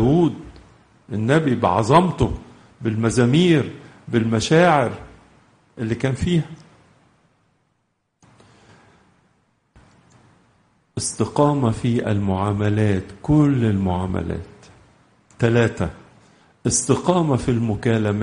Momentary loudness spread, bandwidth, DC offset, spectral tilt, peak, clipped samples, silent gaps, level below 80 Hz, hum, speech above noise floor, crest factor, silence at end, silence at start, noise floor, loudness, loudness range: 13 LU; 10 kHz; under 0.1%; -6 dB/octave; -2 dBFS; under 0.1%; none; -44 dBFS; none; 52 dB; 18 dB; 0 s; 0 s; -70 dBFS; -20 LUFS; 9 LU